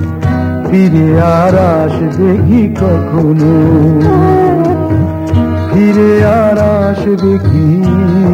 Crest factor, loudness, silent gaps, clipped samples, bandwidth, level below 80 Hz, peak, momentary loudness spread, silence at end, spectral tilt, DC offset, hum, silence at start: 8 dB; -9 LUFS; none; under 0.1%; 15 kHz; -30 dBFS; 0 dBFS; 5 LU; 0 s; -9.5 dB/octave; under 0.1%; none; 0 s